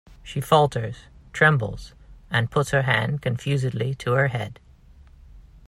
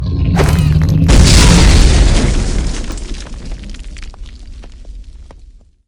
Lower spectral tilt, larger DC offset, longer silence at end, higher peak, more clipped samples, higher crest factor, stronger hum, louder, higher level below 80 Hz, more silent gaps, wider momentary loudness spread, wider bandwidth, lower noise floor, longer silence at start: about the same, -6 dB/octave vs -5 dB/octave; neither; second, 0.3 s vs 0.55 s; second, -4 dBFS vs 0 dBFS; second, under 0.1% vs 0.8%; first, 20 dB vs 12 dB; neither; second, -23 LUFS vs -10 LUFS; second, -48 dBFS vs -14 dBFS; neither; second, 15 LU vs 24 LU; about the same, 15.5 kHz vs 16 kHz; first, -49 dBFS vs -40 dBFS; about the same, 0.1 s vs 0 s